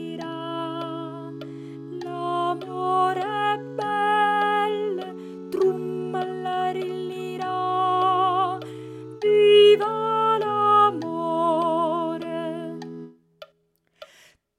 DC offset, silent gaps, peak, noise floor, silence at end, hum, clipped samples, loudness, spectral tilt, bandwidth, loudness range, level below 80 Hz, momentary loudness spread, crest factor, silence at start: under 0.1%; none; -6 dBFS; -68 dBFS; 0.55 s; none; under 0.1%; -23 LUFS; -5.5 dB/octave; 11 kHz; 8 LU; -78 dBFS; 18 LU; 18 dB; 0 s